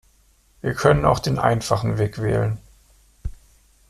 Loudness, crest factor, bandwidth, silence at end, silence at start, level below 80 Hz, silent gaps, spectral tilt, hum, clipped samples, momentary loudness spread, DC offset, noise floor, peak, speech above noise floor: -21 LUFS; 20 dB; 14 kHz; 0.6 s; 0.65 s; -40 dBFS; none; -6 dB/octave; none; under 0.1%; 20 LU; under 0.1%; -58 dBFS; -2 dBFS; 38 dB